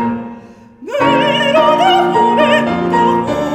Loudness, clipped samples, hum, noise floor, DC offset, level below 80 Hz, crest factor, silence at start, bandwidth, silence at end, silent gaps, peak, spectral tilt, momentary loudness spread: -12 LUFS; under 0.1%; none; -36 dBFS; under 0.1%; -46 dBFS; 12 dB; 0 s; 15 kHz; 0 s; none; 0 dBFS; -5.5 dB/octave; 10 LU